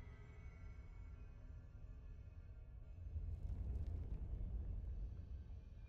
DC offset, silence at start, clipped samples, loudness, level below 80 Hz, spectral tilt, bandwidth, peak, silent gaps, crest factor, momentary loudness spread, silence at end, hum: under 0.1%; 0 s; under 0.1%; -53 LUFS; -50 dBFS; -9.5 dB/octave; 6 kHz; -36 dBFS; none; 14 dB; 11 LU; 0 s; none